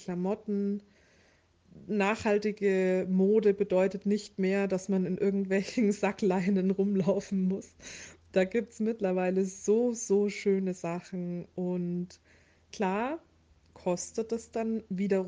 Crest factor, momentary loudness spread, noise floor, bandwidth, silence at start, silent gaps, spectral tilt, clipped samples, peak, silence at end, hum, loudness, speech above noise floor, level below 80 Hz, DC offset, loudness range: 16 dB; 9 LU; -65 dBFS; 9.6 kHz; 0 s; none; -6.5 dB/octave; under 0.1%; -14 dBFS; 0 s; none; -30 LUFS; 36 dB; -68 dBFS; under 0.1%; 7 LU